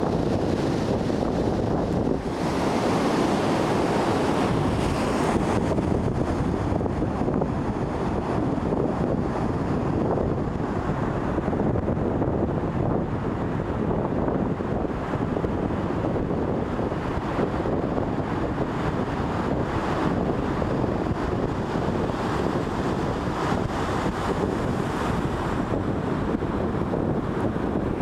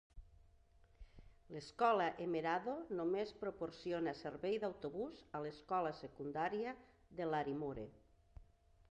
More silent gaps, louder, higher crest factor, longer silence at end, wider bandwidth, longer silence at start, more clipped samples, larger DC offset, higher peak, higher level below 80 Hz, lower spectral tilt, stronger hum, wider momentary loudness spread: neither; first, -25 LUFS vs -42 LUFS; second, 16 dB vs 22 dB; second, 0 s vs 0.5 s; first, 13.5 kHz vs 9.6 kHz; second, 0 s vs 0.15 s; neither; neither; first, -8 dBFS vs -22 dBFS; first, -38 dBFS vs -68 dBFS; about the same, -7.5 dB/octave vs -6.5 dB/octave; neither; second, 4 LU vs 12 LU